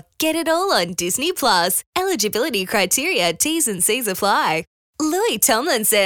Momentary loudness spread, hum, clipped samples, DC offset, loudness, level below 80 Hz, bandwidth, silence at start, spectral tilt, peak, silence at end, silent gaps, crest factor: 5 LU; none; under 0.1%; 0.1%; -18 LUFS; -58 dBFS; over 20 kHz; 0.2 s; -2 dB/octave; -2 dBFS; 0 s; 1.86-1.93 s, 4.67-4.93 s; 18 dB